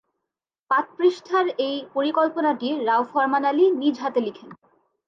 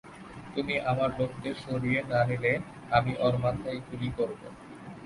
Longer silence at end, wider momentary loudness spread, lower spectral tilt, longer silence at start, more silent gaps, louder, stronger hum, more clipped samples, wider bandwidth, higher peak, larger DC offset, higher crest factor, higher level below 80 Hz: first, 0.55 s vs 0 s; second, 6 LU vs 18 LU; second, -5 dB/octave vs -7.5 dB/octave; first, 0.7 s vs 0.05 s; neither; first, -22 LUFS vs -30 LUFS; neither; neither; second, 7.4 kHz vs 11.5 kHz; about the same, -8 dBFS vs -10 dBFS; neither; second, 14 dB vs 20 dB; second, -80 dBFS vs -54 dBFS